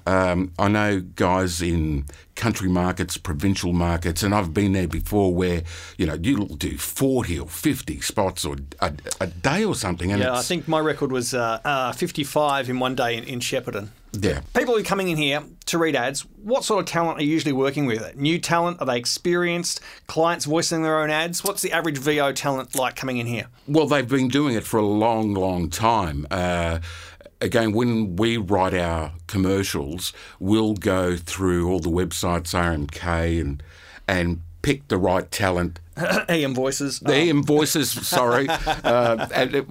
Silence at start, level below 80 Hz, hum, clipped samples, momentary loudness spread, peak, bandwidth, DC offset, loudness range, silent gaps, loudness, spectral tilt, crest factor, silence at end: 0.05 s; -40 dBFS; none; under 0.1%; 7 LU; -4 dBFS; 16 kHz; under 0.1%; 3 LU; none; -23 LUFS; -4.5 dB/octave; 20 dB; 0 s